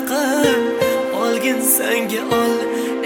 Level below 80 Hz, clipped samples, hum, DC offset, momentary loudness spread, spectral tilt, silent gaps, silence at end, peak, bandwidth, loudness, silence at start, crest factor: -58 dBFS; under 0.1%; none; under 0.1%; 4 LU; -3 dB/octave; none; 0 s; -2 dBFS; 17.5 kHz; -17 LUFS; 0 s; 16 dB